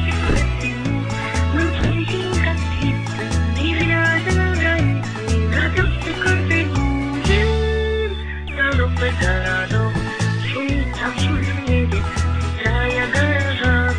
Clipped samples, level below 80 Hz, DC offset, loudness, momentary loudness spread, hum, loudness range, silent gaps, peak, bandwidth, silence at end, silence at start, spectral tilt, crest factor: under 0.1%; -26 dBFS; 0.5%; -19 LUFS; 5 LU; none; 2 LU; none; -4 dBFS; 10.5 kHz; 0 s; 0 s; -6 dB/octave; 14 dB